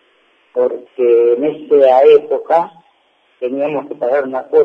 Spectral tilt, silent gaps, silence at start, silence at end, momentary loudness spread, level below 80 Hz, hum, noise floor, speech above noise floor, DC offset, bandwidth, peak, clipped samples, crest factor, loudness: -7 dB/octave; none; 0.55 s; 0 s; 12 LU; -68 dBFS; none; -56 dBFS; 44 dB; under 0.1%; 4.9 kHz; 0 dBFS; under 0.1%; 14 dB; -13 LUFS